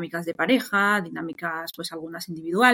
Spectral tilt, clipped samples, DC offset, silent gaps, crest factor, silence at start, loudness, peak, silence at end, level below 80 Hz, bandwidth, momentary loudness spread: -4.5 dB/octave; under 0.1%; under 0.1%; none; 20 dB; 0 s; -25 LUFS; -6 dBFS; 0 s; -72 dBFS; 17 kHz; 13 LU